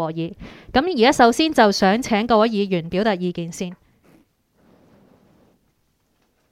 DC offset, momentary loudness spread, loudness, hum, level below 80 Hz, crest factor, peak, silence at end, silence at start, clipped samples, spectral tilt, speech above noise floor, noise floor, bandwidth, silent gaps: under 0.1%; 15 LU; -18 LUFS; none; -50 dBFS; 20 dB; 0 dBFS; 2.75 s; 0 s; under 0.1%; -5 dB/octave; 48 dB; -66 dBFS; 15.5 kHz; none